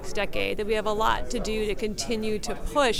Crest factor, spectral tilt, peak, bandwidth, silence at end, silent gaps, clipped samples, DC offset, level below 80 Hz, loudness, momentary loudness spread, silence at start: 18 dB; -3.5 dB/octave; -8 dBFS; 15.5 kHz; 0 s; none; under 0.1%; under 0.1%; -36 dBFS; -28 LUFS; 5 LU; 0 s